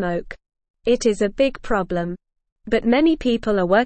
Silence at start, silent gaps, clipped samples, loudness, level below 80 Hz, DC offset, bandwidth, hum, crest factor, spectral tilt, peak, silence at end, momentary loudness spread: 0 s; 0.70-0.74 s, 2.52-2.56 s; under 0.1%; -21 LUFS; -42 dBFS; under 0.1%; 8.8 kHz; none; 16 dB; -5.5 dB/octave; -4 dBFS; 0 s; 13 LU